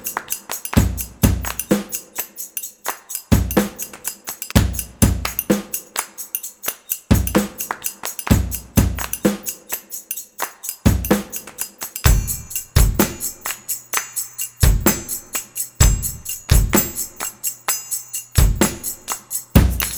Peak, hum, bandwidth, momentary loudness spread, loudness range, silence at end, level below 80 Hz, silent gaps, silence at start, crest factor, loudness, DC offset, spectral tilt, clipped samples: 0 dBFS; none; over 20 kHz; 10 LU; 3 LU; 0 s; -26 dBFS; none; 0 s; 20 dB; -21 LUFS; under 0.1%; -4.5 dB/octave; under 0.1%